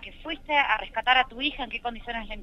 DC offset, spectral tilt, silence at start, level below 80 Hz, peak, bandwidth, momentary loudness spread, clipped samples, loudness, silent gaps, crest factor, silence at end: under 0.1%; -4 dB/octave; 0 s; -46 dBFS; -8 dBFS; 6.8 kHz; 13 LU; under 0.1%; -26 LUFS; none; 20 dB; 0 s